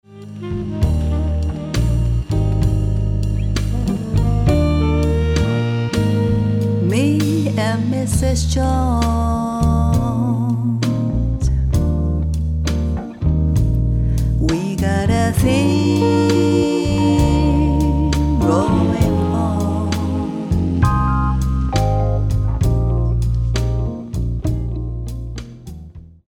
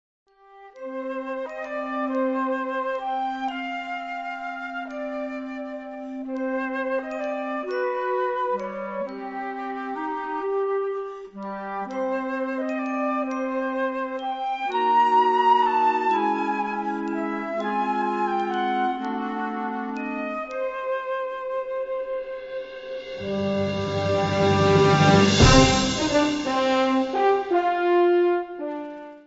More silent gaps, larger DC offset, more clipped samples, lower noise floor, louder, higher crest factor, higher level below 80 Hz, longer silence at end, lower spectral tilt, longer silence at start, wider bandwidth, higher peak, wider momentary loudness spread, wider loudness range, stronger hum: neither; neither; neither; second, -37 dBFS vs -49 dBFS; first, -18 LUFS vs -24 LUFS; second, 16 dB vs 22 dB; first, -22 dBFS vs -42 dBFS; first, 0.2 s vs 0.05 s; first, -7 dB/octave vs -5 dB/octave; second, 0.1 s vs 0.55 s; first, 15 kHz vs 8 kHz; about the same, -2 dBFS vs -2 dBFS; second, 7 LU vs 13 LU; second, 4 LU vs 11 LU; neither